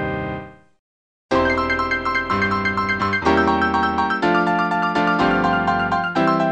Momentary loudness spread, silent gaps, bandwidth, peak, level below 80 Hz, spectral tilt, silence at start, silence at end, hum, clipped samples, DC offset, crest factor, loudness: 3 LU; 0.79-1.29 s; 9.2 kHz; -4 dBFS; -42 dBFS; -6 dB/octave; 0 s; 0 s; none; under 0.1%; 0.1%; 14 dB; -19 LUFS